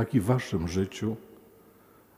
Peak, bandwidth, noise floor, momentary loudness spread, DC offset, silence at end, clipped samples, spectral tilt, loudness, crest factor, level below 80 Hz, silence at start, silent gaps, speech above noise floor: -10 dBFS; 16 kHz; -57 dBFS; 8 LU; under 0.1%; 0.9 s; under 0.1%; -7 dB/octave; -29 LUFS; 20 dB; -52 dBFS; 0 s; none; 30 dB